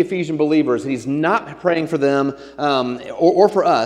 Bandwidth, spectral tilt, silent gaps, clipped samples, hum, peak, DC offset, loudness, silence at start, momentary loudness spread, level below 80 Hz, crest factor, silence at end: 11 kHz; -6.5 dB/octave; none; under 0.1%; none; 0 dBFS; under 0.1%; -18 LUFS; 0 s; 8 LU; -58 dBFS; 18 dB; 0 s